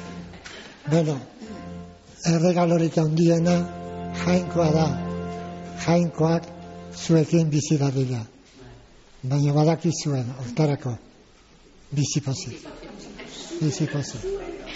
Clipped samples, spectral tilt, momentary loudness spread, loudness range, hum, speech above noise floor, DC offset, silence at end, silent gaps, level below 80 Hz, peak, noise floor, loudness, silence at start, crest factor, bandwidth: under 0.1%; -7 dB/octave; 19 LU; 7 LU; none; 30 dB; under 0.1%; 0 s; none; -52 dBFS; -8 dBFS; -53 dBFS; -24 LUFS; 0 s; 16 dB; 8 kHz